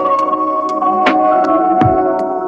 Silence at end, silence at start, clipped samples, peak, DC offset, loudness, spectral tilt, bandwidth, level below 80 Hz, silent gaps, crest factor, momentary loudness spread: 0 s; 0 s; under 0.1%; -2 dBFS; under 0.1%; -13 LUFS; -7.5 dB/octave; 8 kHz; -40 dBFS; none; 12 dB; 4 LU